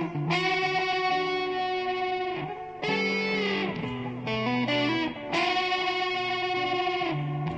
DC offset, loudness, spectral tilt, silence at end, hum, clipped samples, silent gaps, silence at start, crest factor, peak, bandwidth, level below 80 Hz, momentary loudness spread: under 0.1%; -27 LUFS; -5.5 dB/octave; 0 s; none; under 0.1%; none; 0 s; 14 dB; -14 dBFS; 8 kHz; -60 dBFS; 6 LU